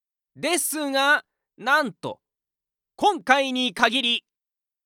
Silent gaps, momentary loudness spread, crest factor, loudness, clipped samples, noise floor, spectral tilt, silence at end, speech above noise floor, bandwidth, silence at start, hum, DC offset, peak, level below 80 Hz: none; 11 LU; 20 dB; -22 LUFS; under 0.1%; -90 dBFS; -1.5 dB/octave; 0.65 s; 67 dB; 17.5 kHz; 0.35 s; none; under 0.1%; -4 dBFS; -70 dBFS